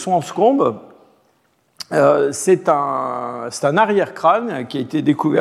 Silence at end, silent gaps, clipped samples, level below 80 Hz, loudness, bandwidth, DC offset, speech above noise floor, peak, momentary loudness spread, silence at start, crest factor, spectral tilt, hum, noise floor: 0 s; none; under 0.1%; -70 dBFS; -17 LUFS; 14 kHz; under 0.1%; 44 dB; -2 dBFS; 10 LU; 0 s; 16 dB; -5.5 dB/octave; none; -61 dBFS